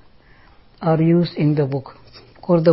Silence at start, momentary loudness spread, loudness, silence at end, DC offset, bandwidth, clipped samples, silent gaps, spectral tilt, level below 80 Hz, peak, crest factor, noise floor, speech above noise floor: 0.8 s; 15 LU; -19 LUFS; 0 s; under 0.1%; 5.8 kHz; under 0.1%; none; -13 dB/octave; -54 dBFS; -4 dBFS; 16 dB; -49 dBFS; 32 dB